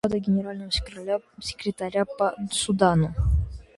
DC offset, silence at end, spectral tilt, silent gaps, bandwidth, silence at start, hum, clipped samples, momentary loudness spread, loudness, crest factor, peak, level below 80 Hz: under 0.1%; 0.15 s; -5.5 dB/octave; none; 11.5 kHz; 0.05 s; none; under 0.1%; 9 LU; -26 LUFS; 20 dB; -4 dBFS; -34 dBFS